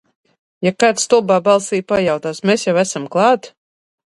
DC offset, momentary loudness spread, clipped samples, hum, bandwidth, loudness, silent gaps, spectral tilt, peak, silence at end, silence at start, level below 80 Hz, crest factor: under 0.1%; 6 LU; under 0.1%; none; 11.5 kHz; -16 LUFS; none; -4 dB/octave; 0 dBFS; 0.55 s; 0.6 s; -58 dBFS; 16 dB